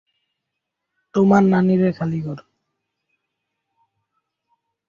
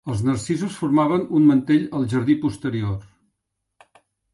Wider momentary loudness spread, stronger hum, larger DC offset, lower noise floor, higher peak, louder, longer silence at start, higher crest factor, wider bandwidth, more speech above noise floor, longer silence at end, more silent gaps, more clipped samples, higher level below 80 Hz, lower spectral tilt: first, 15 LU vs 9 LU; neither; neither; about the same, -80 dBFS vs -78 dBFS; first, -2 dBFS vs -6 dBFS; first, -18 LUFS vs -21 LUFS; first, 1.15 s vs 0.05 s; about the same, 20 dB vs 16 dB; second, 7.2 kHz vs 11.5 kHz; first, 64 dB vs 58 dB; first, 2.5 s vs 1.3 s; neither; neither; second, -60 dBFS vs -50 dBFS; first, -9 dB/octave vs -7.5 dB/octave